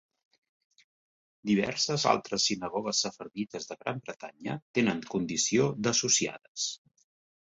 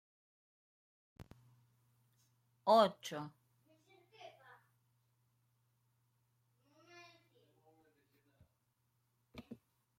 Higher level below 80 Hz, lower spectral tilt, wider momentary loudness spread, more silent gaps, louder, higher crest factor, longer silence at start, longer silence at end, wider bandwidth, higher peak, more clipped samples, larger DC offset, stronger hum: first, -68 dBFS vs -82 dBFS; second, -3 dB/octave vs -5 dB/octave; second, 12 LU vs 29 LU; first, 4.62-4.74 s, 6.48-6.55 s vs none; first, -29 LUFS vs -34 LUFS; about the same, 24 dB vs 26 dB; first, 1.45 s vs 1.2 s; first, 0.65 s vs 0.45 s; second, 8.2 kHz vs 15.5 kHz; first, -6 dBFS vs -18 dBFS; neither; neither; neither